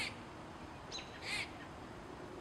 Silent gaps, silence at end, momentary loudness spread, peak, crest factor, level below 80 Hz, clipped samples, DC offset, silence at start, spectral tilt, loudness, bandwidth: none; 0 s; 10 LU; -26 dBFS; 20 dB; -62 dBFS; under 0.1%; under 0.1%; 0 s; -3 dB/octave; -45 LUFS; 15.5 kHz